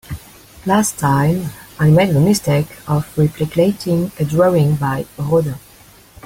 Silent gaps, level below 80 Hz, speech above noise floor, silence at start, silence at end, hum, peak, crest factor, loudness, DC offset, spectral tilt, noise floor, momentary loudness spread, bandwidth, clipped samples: none; -44 dBFS; 30 dB; 0.1 s; 0.65 s; none; -2 dBFS; 14 dB; -16 LUFS; under 0.1%; -6.5 dB/octave; -45 dBFS; 11 LU; 16.5 kHz; under 0.1%